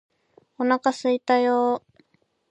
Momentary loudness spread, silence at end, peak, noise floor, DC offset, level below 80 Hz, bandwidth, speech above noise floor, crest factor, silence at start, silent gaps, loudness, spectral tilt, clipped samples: 7 LU; 0.7 s; -6 dBFS; -66 dBFS; under 0.1%; -78 dBFS; 9.2 kHz; 45 dB; 18 dB; 0.6 s; none; -23 LUFS; -4 dB/octave; under 0.1%